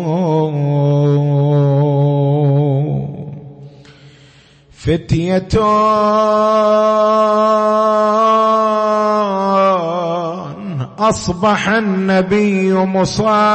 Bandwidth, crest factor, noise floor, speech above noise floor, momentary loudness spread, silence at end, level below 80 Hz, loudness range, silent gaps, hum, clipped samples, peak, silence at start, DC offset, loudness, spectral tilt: 8.6 kHz; 12 dB; -45 dBFS; 33 dB; 8 LU; 0 s; -42 dBFS; 6 LU; none; none; under 0.1%; -2 dBFS; 0 s; under 0.1%; -14 LUFS; -7 dB/octave